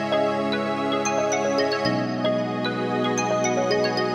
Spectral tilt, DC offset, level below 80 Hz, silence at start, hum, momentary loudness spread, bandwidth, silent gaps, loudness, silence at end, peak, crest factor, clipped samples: -4.5 dB/octave; under 0.1%; -62 dBFS; 0 s; none; 3 LU; 12.5 kHz; none; -23 LUFS; 0 s; -8 dBFS; 14 dB; under 0.1%